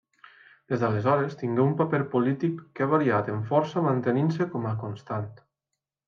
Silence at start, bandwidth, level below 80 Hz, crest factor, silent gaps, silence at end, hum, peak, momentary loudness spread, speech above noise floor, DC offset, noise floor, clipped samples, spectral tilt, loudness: 0.7 s; 7.2 kHz; -70 dBFS; 18 dB; none; 0.75 s; none; -8 dBFS; 10 LU; 60 dB; under 0.1%; -85 dBFS; under 0.1%; -9 dB/octave; -26 LUFS